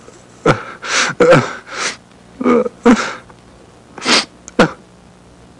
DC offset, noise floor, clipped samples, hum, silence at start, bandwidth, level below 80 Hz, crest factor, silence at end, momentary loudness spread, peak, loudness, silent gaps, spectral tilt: under 0.1%; -43 dBFS; under 0.1%; none; 0.45 s; 11.5 kHz; -44 dBFS; 16 dB; 0.85 s; 12 LU; -2 dBFS; -15 LUFS; none; -4 dB/octave